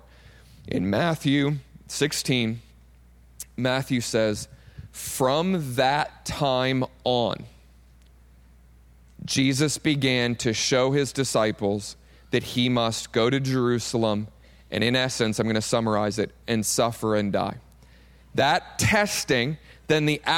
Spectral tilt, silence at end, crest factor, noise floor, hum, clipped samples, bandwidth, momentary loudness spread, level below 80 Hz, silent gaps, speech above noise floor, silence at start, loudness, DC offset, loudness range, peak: -4.5 dB/octave; 0 s; 16 dB; -53 dBFS; none; under 0.1%; 17.5 kHz; 10 LU; -52 dBFS; none; 29 dB; 0.65 s; -24 LUFS; under 0.1%; 3 LU; -8 dBFS